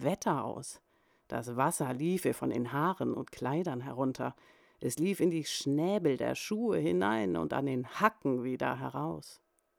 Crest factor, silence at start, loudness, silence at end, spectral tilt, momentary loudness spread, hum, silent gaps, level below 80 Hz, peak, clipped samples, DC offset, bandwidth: 22 dB; 0 s; -33 LUFS; 0.45 s; -5.5 dB/octave; 10 LU; none; none; -68 dBFS; -12 dBFS; under 0.1%; under 0.1%; 19.5 kHz